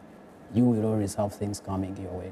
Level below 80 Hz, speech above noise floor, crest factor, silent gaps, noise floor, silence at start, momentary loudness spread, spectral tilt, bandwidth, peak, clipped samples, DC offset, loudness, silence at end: -58 dBFS; 22 dB; 14 dB; none; -49 dBFS; 0 s; 10 LU; -7.5 dB/octave; 14 kHz; -14 dBFS; under 0.1%; under 0.1%; -28 LUFS; 0 s